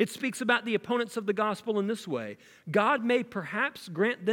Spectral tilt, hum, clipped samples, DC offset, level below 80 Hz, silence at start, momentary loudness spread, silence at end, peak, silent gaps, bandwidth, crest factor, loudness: -5 dB/octave; none; under 0.1%; under 0.1%; -78 dBFS; 0 s; 8 LU; 0 s; -10 dBFS; none; 17.5 kHz; 20 dB; -29 LUFS